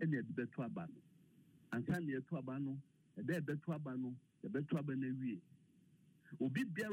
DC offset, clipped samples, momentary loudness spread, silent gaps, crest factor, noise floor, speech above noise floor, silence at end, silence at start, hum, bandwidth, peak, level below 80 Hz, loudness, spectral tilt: under 0.1%; under 0.1%; 11 LU; none; 16 dB; -70 dBFS; 27 dB; 0 s; 0 s; none; 16 kHz; -28 dBFS; -80 dBFS; -44 LUFS; -8 dB/octave